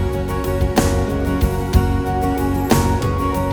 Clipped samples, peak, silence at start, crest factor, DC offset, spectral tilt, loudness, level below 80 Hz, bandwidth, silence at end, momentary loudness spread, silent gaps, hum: under 0.1%; 0 dBFS; 0 s; 16 dB; under 0.1%; -6.5 dB/octave; -19 LUFS; -24 dBFS; over 20 kHz; 0 s; 4 LU; none; none